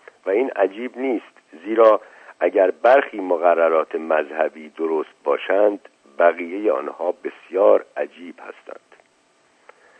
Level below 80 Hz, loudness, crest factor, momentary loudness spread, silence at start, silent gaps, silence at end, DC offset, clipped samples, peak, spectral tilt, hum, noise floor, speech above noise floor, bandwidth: -84 dBFS; -20 LUFS; 20 dB; 15 LU; 0.25 s; none; 1.5 s; under 0.1%; under 0.1%; 0 dBFS; -5.5 dB/octave; none; -60 dBFS; 40 dB; 8.4 kHz